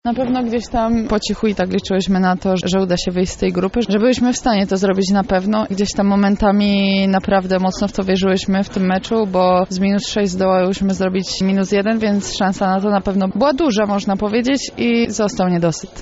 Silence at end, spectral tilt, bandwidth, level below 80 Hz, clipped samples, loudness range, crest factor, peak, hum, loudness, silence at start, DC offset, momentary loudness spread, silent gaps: 0 s; -5 dB/octave; 8 kHz; -38 dBFS; under 0.1%; 2 LU; 14 dB; -2 dBFS; none; -17 LUFS; 0.05 s; under 0.1%; 4 LU; none